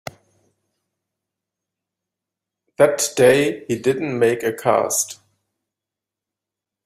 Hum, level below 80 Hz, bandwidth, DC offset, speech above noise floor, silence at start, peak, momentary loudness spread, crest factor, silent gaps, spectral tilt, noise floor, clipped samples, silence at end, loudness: none; -62 dBFS; 15.5 kHz; under 0.1%; 68 dB; 2.8 s; -2 dBFS; 8 LU; 20 dB; none; -3.5 dB/octave; -86 dBFS; under 0.1%; 1.7 s; -18 LUFS